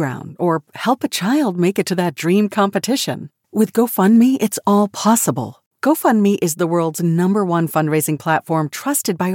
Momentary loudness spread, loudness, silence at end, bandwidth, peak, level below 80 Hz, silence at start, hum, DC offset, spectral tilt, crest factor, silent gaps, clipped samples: 6 LU; -17 LUFS; 0 s; 17 kHz; -4 dBFS; -74 dBFS; 0 s; none; under 0.1%; -5 dB/octave; 14 dB; 5.66-5.71 s; under 0.1%